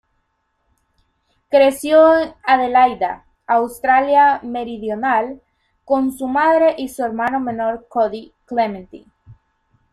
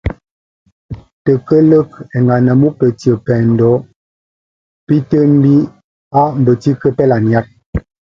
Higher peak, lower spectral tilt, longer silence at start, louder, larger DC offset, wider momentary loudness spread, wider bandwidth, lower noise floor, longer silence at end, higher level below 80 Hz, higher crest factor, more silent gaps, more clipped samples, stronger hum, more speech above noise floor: about the same, -2 dBFS vs 0 dBFS; second, -4.5 dB/octave vs -10 dB/octave; first, 1.5 s vs 0.05 s; second, -17 LUFS vs -12 LUFS; neither; about the same, 12 LU vs 14 LU; first, 14 kHz vs 7.4 kHz; second, -68 dBFS vs under -90 dBFS; first, 0.6 s vs 0.3 s; second, -54 dBFS vs -36 dBFS; about the same, 16 dB vs 12 dB; second, none vs 0.31-0.66 s, 0.72-0.89 s, 1.13-1.25 s, 3.96-4.87 s, 5.84-6.11 s, 7.66-7.73 s; neither; neither; second, 52 dB vs over 79 dB